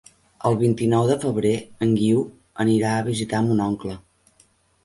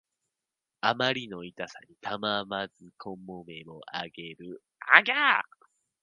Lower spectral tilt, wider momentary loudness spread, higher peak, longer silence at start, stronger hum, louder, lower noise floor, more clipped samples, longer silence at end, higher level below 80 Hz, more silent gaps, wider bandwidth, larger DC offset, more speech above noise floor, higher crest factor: first, -7 dB/octave vs -4 dB/octave; second, 8 LU vs 24 LU; second, -6 dBFS vs 0 dBFS; second, 0.45 s vs 0.85 s; neither; first, -22 LUFS vs -25 LUFS; second, -60 dBFS vs -88 dBFS; neither; first, 0.85 s vs 0.6 s; first, -54 dBFS vs -74 dBFS; neither; first, 11.5 kHz vs 10 kHz; neither; second, 39 dB vs 59 dB; second, 16 dB vs 30 dB